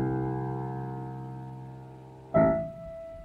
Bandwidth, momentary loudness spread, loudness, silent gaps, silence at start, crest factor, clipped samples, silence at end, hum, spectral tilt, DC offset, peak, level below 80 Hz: 4.3 kHz; 20 LU; -30 LUFS; none; 0 s; 22 dB; under 0.1%; 0 s; none; -10.5 dB/octave; under 0.1%; -10 dBFS; -52 dBFS